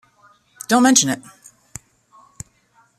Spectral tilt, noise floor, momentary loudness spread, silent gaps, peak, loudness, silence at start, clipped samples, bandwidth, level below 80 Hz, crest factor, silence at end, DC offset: -2.5 dB/octave; -58 dBFS; 26 LU; none; -2 dBFS; -16 LUFS; 0.7 s; under 0.1%; 14.5 kHz; -60 dBFS; 22 dB; 1.8 s; under 0.1%